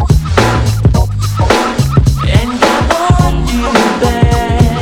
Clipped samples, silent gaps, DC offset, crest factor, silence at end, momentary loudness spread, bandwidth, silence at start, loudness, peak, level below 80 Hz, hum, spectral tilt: 0.7%; none; under 0.1%; 10 dB; 0 s; 2 LU; 18 kHz; 0 s; -11 LUFS; 0 dBFS; -16 dBFS; none; -6 dB/octave